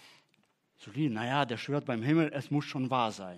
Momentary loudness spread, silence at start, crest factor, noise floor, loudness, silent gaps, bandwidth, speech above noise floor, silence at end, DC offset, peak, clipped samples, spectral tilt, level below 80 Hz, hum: 5 LU; 0.05 s; 20 dB; -72 dBFS; -31 LUFS; none; 12.5 kHz; 41 dB; 0 s; under 0.1%; -12 dBFS; under 0.1%; -6.5 dB/octave; -82 dBFS; none